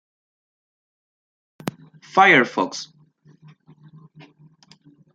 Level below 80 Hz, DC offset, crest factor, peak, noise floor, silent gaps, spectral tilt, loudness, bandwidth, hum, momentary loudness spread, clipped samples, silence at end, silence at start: -72 dBFS; under 0.1%; 24 dB; -2 dBFS; -54 dBFS; none; -4 dB/octave; -17 LUFS; 11.5 kHz; none; 20 LU; under 0.1%; 2.3 s; 1.65 s